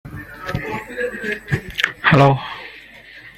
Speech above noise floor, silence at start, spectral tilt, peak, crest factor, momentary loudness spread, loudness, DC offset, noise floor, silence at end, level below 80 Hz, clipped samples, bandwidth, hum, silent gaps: 24 dB; 0.05 s; -6.5 dB/octave; 0 dBFS; 20 dB; 23 LU; -19 LUFS; under 0.1%; -41 dBFS; 0.05 s; -44 dBFS; under 0.1%; 14 kHz; none; none